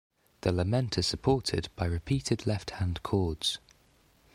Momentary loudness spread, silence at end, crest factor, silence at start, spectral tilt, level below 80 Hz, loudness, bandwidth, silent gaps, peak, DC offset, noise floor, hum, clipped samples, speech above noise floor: 6 LU; 0.75 s; 18 dB; 0.45 s; -5.5 dB/octave; -46 dBFS; -31 LUFS; 15 kHz; none; -12 dBFS; under 0.1%; -64 dBFS; none; under 0.1%; 35 dB